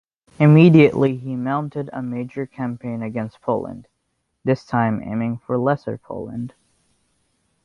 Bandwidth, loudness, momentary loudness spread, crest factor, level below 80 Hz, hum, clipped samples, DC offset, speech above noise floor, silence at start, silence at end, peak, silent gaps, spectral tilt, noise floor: 6.6 kHz; -20 LUFS; 19 LU; 18 dB; -56 dBFS; none; under 0.1%; under 0.1%; 54 dB; 0.4 s; 1.15 s; -2 dBFS; none; -9.5 dB/octave; -72 dBFS